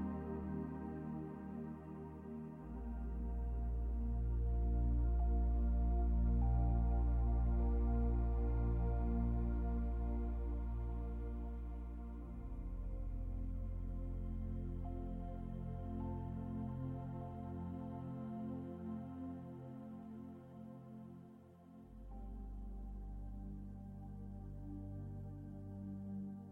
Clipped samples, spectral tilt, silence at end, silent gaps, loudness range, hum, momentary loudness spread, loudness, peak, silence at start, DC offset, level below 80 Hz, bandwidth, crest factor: under 0.1%; -11.5 dB/octave; 0 s; none; 15 LU; none; 14 LU; -43 LUFS; -26 dBFS; 0 s; under 0.1%; -42 dBFS; 2.6 kHz; 14 dB